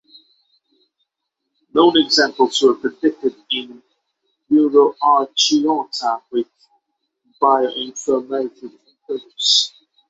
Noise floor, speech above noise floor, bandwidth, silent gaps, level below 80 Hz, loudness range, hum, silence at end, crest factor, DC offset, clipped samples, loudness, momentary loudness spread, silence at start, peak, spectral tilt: -78 dBFS; 61 dB; 8 kHz; none; -66 dBFS; 4 LU; none; 0.4 s; 18 dB; under 0.1%; under 0.1%; -17 LUFS; 11 LU; 1.75 s; -2 dBFS; -2 dB/octave